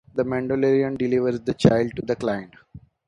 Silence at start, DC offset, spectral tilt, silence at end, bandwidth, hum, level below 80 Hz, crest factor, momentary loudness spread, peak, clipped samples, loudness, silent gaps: 0.15 s; under 0.1%; -7.5 dB/octave; 0.3 s; 10.5 kHz; none; -50 dBFS; 22 dB; 7 LU; 0 dBFS; under 0.1%; -22 LUFS; none